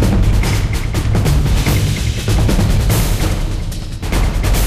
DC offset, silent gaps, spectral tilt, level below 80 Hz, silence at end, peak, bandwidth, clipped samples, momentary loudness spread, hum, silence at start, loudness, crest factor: under 0.1%; none; -5.5 dB/octave; -16 dBFS; 0 s; -4 dBFS; 15.5 kHz; under 0.1%; 6 LU; none; 0 s; -16 LUFS; 10 dB